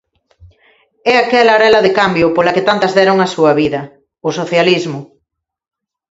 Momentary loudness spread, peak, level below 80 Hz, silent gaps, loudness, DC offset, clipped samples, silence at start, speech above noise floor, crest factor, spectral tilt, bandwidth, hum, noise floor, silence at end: 12 LU; 0 dBFS; -50 dBFS; none; -12 LUFS; under 0.1%; under 0.1%; 0.45 s; 62 dB; 14 dB; -5 dB/octave; 8 kHz; none; -74 dBFS; 1.1 s